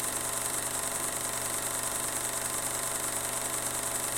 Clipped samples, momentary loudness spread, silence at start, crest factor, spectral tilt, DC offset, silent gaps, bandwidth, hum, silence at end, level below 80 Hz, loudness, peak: under 0.1%; 0 LU; 0 s; 18 dB; -1 dB/octave; under 0.1%; none; 17 kHz; none; 0 s; -56 dBFS; -30 LUFS; -14 dBFS